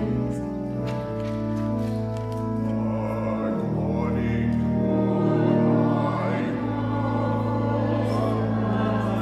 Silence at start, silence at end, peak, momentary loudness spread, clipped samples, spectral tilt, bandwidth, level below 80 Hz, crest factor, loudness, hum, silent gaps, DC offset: 0 s; 0 s; -8 dBFS; 7 LU; under 0.1%; -9 dB/octave; 9.2 kHz; -44 dBFS; 14 dB; -25 LUFS; none; none; under 0.1%